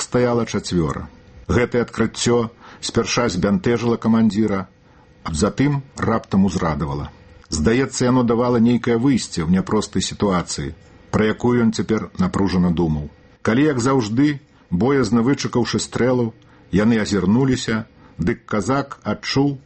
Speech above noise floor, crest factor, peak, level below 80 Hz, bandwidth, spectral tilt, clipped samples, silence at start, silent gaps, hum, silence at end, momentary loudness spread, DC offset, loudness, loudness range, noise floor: 31 dB; 16 dB; -2 dBFS; -40 dBFS; 8.8 kHz; -6 dB/octave; under 0.1%; 0 s; none; none; 0.05 s; 10 LU; under 0.1%; -19 LUFS; 2 LU; -50 dBFS